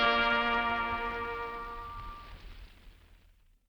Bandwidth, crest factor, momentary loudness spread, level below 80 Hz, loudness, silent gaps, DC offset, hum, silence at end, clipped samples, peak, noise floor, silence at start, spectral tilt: over 20 kHz; 22 dB; 23 LU; -50 dBFS; -31 LUFS; none; under 0.1%; none; 0.55 s; under 0.1%; -12 dBFS; -63 dBFS; 0 s; -4.5 dB/octave